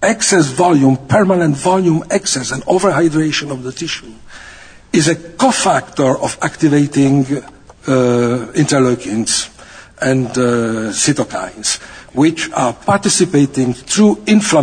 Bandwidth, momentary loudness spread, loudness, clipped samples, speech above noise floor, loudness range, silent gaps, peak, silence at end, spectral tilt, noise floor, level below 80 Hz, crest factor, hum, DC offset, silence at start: 9.6 kHz; 8 LU; -14 LUFS; under 0.1%; 24 dB; 3 LU; none; 0 dBFS; 0 s; -4.5 dB/octave; -38 dBFS; -46 dBFS; 14 dB; none; under 0.1%; 0 s